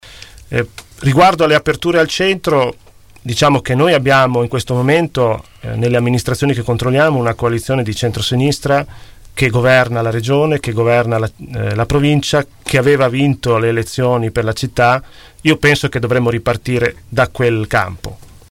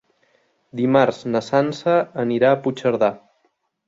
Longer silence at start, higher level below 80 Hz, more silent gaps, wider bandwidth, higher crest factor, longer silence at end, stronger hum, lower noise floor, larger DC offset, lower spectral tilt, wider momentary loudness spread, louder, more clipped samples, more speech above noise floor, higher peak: second, 0.05 s vs 0.75 s; first, -38 dBFS vs -64 dBFS; neither; first, 16.5 kHz vs 7.8 kHz; second, 12 dB vs 18 dB; second, 0.25 s vs 0.7 s; neither; second, -37 dBFS vs -67 dBFS; neither; second, -5.5 dB/octave vs -7 dB/octave; about the same, 8 LU vs 6 LU; first, -14 LUFS vs -19 LUFS; neither; second, 23 dB vs 49 dB; about the same, -2 dBFS vs -2 dBFS